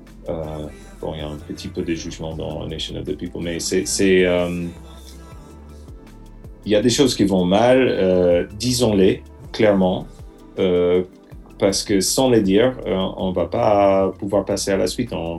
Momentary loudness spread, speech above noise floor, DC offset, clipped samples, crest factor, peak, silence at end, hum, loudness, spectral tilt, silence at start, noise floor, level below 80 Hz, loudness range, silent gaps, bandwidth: 16 LU; 21 dB; under 0.1%; under 0.1%; 16 dB; -2 dBFS; 0 s; none; -19 LUFS; -5 dB/octave; 0 s; -40 dBFS; -40 dBFS; 5 LU; none; 13 kHz